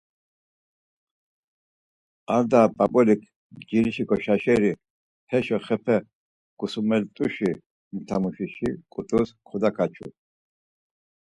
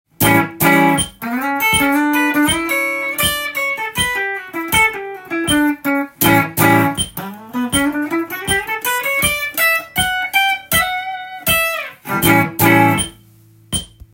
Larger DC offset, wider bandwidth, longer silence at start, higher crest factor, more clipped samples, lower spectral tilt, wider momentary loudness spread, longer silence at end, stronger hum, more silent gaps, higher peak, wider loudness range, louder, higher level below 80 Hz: neither; second, 10.5 kHz vs 17 kHz; first, 2.3 s vs 0.2 s; first, 22 dB vs 16 dB; neither; first, -7.5 dB/octave vs -3.5 dB/octave; first, 14 LU vs 10 LU; first, 1.25 s vs 0.3 s; neither; first, 3.36-3.50 s, 4.90-5.27 s, 6.15-6.57 s, 7.66-7.91 s vs none; second, -4 dBFS vs 0 dBFS; first, 6 LU vs 2 LU; second, -24 LUFS vs -15 LUFS; second, -58 dBFS vs -42 dBFS